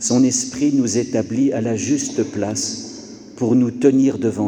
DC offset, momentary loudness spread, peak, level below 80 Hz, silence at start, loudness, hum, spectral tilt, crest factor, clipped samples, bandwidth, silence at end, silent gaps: under 0.1%; 9 LU; -2 dBFS; -58 dBFS; 0 s; -18 LUFS; none; -5 dB/octave; 16 dB; under 0.1%; 11.5 kHz; 0 s; none